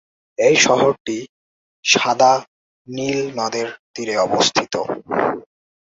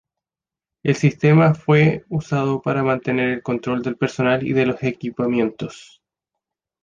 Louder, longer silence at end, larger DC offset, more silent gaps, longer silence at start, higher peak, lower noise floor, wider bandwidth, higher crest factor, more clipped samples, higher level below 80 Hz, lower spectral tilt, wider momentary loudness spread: about the same, -18 LUFS vs -19 LUFS; second, 0.5 s vs 1 s; neither; first, 1.00-1.05 s, 1.29-1.83 s, 2.47-2.85 s, 3.79-3.94 s vs none; second, 0.4 s vs 0.85 s; about the same, -2 dBFS vs -4 dBFS; about the same, under -90 dBFS vs -90 dBFS; about the same, 8 kHz vs 7.4 kHz; about the same, 18 dB vs 16 dB; neither; about the same, -60 dBFS vs -56 dBFS; second, -2.5 dB/octave vs -7.5 dB/octave; first, 15 LU vs 10 LU